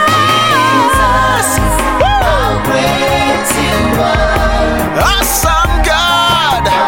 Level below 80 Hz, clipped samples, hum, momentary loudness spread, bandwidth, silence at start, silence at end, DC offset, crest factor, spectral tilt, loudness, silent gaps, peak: -20 dBFS; under 0.1%; none; 3 LU; 17 kHz; 0 s; 0 s; 0.5%; 10 dB; -3.5 dB/octave; -10 LUFS; none; 0 dBFS